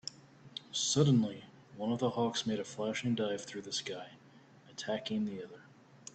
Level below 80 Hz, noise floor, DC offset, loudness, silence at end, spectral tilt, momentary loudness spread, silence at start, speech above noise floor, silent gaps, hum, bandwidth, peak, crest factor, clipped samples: -72 dBFS; -59 dBFS; under 0.1%; -34 LUFS; 0.2 s; -4.5 dB/octave; 21 LU; 0.05 s; 25 dB; none; none; 9 kHz; -16 dBFS; 20 dB; under 0.1%